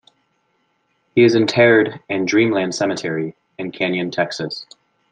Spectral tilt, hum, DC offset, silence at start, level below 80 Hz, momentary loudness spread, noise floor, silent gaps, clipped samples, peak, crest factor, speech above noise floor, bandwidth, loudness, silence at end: -5 dB/octave; none; under 0.1%; 1.15 s; -64 dBFS; 15 LU; -66 dBFS; none; under 0.1%; -2 dBFS; 18 dB; 49 dB; 9.2 kHz; -17 LUFS; 0.5 s